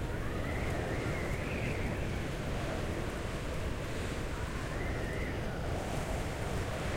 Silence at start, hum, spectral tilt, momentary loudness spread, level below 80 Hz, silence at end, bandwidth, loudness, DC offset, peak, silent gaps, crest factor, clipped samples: 0 s; none; -5.5 dB/octave; 3 LU; -40 dBFS; 0 s; 16 kHz; -37 LUFS; under 0.1%; -22 dBFS; none; 14 dB; under 0.1%